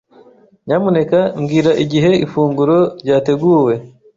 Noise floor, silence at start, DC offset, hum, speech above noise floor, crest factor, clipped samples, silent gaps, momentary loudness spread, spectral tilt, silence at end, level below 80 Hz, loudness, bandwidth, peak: -46 dBFS; 0.65 s; under 0.1%; none; 33 dB; 12 dB; under 0.1%; none; 4 LU; -7.5 dB/octave; 0.3 s; -52 dBFS; -14 LUFS; 7.6 kHz; -2 dBFS